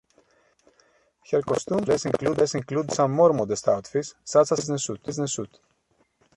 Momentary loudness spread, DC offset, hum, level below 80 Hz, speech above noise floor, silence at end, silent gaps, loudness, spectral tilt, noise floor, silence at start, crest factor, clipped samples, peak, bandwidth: 10 LU; under 0.1%; none; -60 dBFS; 44 dB; 0.9 s; none; -24 LUFS; -5 dB/octave; -68 dBFS; 1.3 s; 18 dB; under 0.1%; -6 dBFS; 11.5 kHz